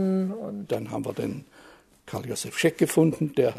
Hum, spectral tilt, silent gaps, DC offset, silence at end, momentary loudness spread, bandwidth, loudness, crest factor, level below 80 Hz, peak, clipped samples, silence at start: none; -5.5 dB/octave; none; under 0.1%; 0 s; 13 LU; 13.5 kHz; -27 LUFS; 20 dB; -64 dBFS; -6 dBFS; under 0.1%; 0 s